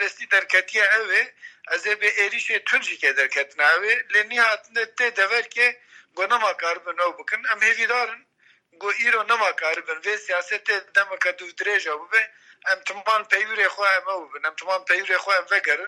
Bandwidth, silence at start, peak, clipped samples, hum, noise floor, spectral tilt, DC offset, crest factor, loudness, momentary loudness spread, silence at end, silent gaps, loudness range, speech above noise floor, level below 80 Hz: 13 kHz; 0 s; -4 dBFS; under 0.1%; none; -60 dBFS; 0.5 dB/octave; under 0.1%; 18 dB; -21 LUFS; 9 LU; 0 s; none; 3 LU; 37 dB; -88 dBFS